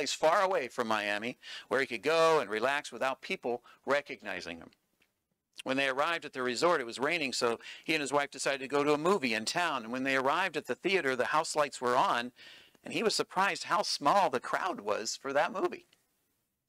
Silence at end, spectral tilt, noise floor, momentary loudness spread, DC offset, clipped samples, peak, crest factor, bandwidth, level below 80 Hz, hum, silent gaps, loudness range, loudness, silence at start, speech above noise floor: 0.9 s; -3 dB/octave; -81 dBFS; 11 LU; under 0.1%; under 0.1%; -14 dBFS; 18 dB; 16 kHz; -78 dBFS; none; none; 4 LU; -31 LUFS; 0 s; 50 dB